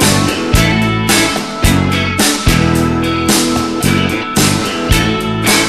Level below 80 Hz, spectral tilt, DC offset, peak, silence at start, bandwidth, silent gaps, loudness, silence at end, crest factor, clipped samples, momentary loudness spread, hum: -24 dBFS; -4 dB/octave; 0.7%; 0 dBFS; 0 s; 14.5 kHz; none; -12 LUFS; 0 s; 12 dB; under 0.1%; 3 LU; none